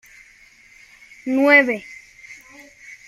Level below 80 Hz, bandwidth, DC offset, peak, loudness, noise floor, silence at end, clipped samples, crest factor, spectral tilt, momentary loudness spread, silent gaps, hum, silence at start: -66 dBFS; 15 kHz; under 0.1%; -2 dBFS; -16 LUFS; -50 dBFS; 0.15 s; under 0.1%; 20 dB; -4 dB/octave; 28 LU; none; none; 1.25 s